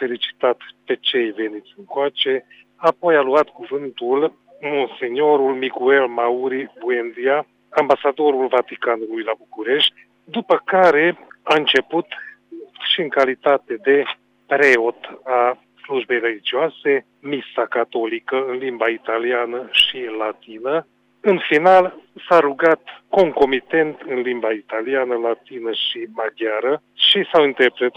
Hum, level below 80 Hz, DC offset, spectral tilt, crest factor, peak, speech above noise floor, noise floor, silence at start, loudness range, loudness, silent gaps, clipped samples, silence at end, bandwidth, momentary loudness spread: 50 Hz at -70 dBFS; -66 dBFS; under 0.1%; -4.5 dB/octave; 16 dB; -2 dBFS; 21 dB; -39 dBFS; 0 s; 4 LU; -19 LUFS; none; under 0.1%; 0.05 s; 10 kHz; 12 LU